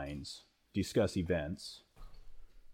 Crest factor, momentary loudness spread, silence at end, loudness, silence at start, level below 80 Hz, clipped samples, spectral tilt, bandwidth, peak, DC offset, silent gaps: 18 dB; 16 LU; 0 s; -37 LUFS; 0 s; -54 dBFS; under 0.1%; -6 dB/octave; 17 kHz; -20 dBFS; under 0.1%; none